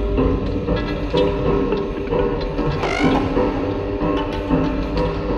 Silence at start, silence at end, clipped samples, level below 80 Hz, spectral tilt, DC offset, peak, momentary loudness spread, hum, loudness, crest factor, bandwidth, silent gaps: 0 s; 0 s; under 0.1%; -28 dBFS; -7.5 dB/octave; under 0.1%; -6 dBFS; 4 LU; none; -20 LUFS; 14 dB; 9 kHz; none